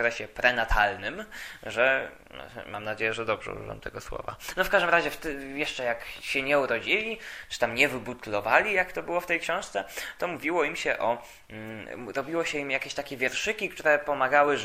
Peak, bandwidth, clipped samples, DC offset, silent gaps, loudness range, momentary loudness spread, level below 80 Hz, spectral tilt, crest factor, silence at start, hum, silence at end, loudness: -4 dBFS; 15.5 kHz; under 0.1%; under 0.1%; none; 4 LU; 15 LU; -46 dBFS; -3.5 dB/octave; 24 dB; 0 s; none; 0 s; -27 LUFS